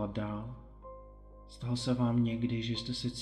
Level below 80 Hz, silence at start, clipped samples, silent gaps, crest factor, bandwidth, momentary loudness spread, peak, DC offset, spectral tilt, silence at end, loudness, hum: -54 dBFS; 0 s; under 0.1%; none; 16 dB; 10.5 kHz; 21 LU; -18 dBFS; under 0.1%; -6.5 dB/octave; 0 s; -34 LUFS; none